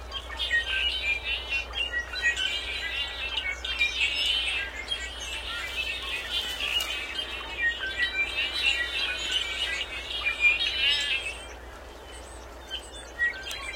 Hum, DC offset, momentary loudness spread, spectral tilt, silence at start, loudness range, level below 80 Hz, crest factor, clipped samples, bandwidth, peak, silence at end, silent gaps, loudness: none; under 0.1%; 14 LU; -1 dB/octave; 0 s; 4 LU; -46 dBFS; 18 dB; under 0.1%; 16.5 kHz; -12 dBFS; 0 s; none; -27 LUFS